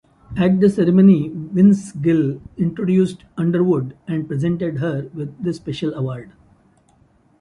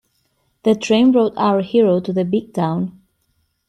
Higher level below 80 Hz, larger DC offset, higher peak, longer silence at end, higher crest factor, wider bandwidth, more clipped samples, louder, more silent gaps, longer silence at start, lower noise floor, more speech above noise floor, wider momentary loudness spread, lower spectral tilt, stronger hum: first, -50 dBFS vs -60 dBFS; neither; about the same, -2 dBFS vs -4 dBFS; first, 1.15 s vs 0.8 s; about the same, 16 dB vs 14 dB; about the same, 10.5 kHz vs 10.5 kHz; neither; about the same, -18 LUFS vs -17 LUFS; neither; second, 0.3 s vs 0.65 s; second, -56 dBFS vs -66 dBFS; second, 38 dB vs 50 dB; first, 12 LU vs 8 LU; first, -8.5 dB/octave vs -7 dB/octave; neither